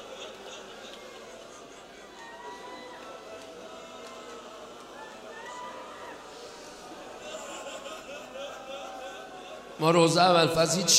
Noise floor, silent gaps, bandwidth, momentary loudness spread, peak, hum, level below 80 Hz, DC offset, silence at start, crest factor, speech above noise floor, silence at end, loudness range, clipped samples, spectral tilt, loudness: -48 dBFS; none; 16 kHz; 22 LU; -6 dBFS; none; -66 dBFS; under 0.1%; 0 s; 24 dB; 26 dB; 0 s; 17 LU; under 0.1%; -3 dB/octave; -28 LUFS